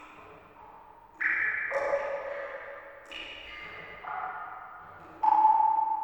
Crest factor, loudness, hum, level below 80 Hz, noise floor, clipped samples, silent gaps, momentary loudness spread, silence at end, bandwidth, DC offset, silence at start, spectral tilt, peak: 18 dB; -29 LUFS; none; -66 dBFS; -52 dBFS; under 0.1%; none; 23 LU; 0 s; 18 kHz; under 0.1%; 0 s; -3.5 dB/octave; -12 dBFS